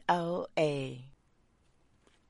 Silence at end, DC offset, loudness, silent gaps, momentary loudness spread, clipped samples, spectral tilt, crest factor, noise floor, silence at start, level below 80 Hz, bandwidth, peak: 1.2 s; under 0.1%; -33 LUFS; none; 12 LU; under 0.1%; -6 dB/octave; 22 dB; -69 dBFS; 0.05 s; -68 dBFS; 11.5 kHz; -14 dBFS